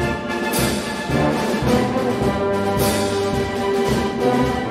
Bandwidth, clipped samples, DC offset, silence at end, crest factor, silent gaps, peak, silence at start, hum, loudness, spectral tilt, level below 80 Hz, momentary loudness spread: 16 kHz; under 0.1%; under 0.1%; 0 s; 16 dB; none; -4 dBFS; 0 s; none; -20 LUFS; -5 dB/octave; -36 dBFS; 3 LU